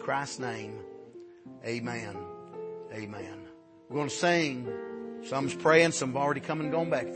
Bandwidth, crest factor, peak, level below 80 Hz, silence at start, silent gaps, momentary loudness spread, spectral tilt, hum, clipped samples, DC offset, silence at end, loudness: 8.8 kHz; 24 dB; -6 dBFS; -72 dBFS; 0 s; none; 20 LU; -4.5 dB/octave; none; under 0.1%; under 0.1%; 0 s; -30 LUFS